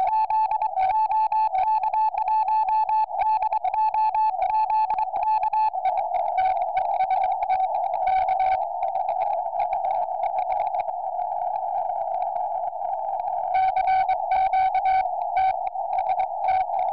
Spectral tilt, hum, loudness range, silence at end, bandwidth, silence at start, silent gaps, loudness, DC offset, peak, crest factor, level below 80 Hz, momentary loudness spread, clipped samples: 0 dB/octave; none; 4 LU; 0 s; 5.4 kHz; 0 s; none; -24 LUFS; 0.4%; -16 dBFS; 8 dB; -56 dBFS; 5 LU; under 0.1%